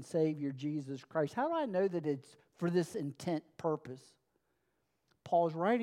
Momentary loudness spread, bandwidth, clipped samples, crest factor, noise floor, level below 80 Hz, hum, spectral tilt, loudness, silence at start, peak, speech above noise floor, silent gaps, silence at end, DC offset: 8 LU; 15 kHz; under 0.1%; 18 dB; -81 dBFS; -84 dBFS; none; -7 dB/octave; -36 LUFS; 0 s; -18 dBFS; 46 dB; none; 0 s; under 0.1%